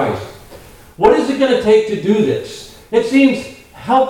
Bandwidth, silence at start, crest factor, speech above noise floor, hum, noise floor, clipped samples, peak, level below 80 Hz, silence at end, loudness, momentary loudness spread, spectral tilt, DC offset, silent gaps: 16 kHz; 0 s; 14 dB; 25 dB; none; -39 dBFS; under 0.1%; 0 dBFS; -46 dBFS; 0 s; -14 LUFS; 19 LU; -6 dB/octave; 0.1%; none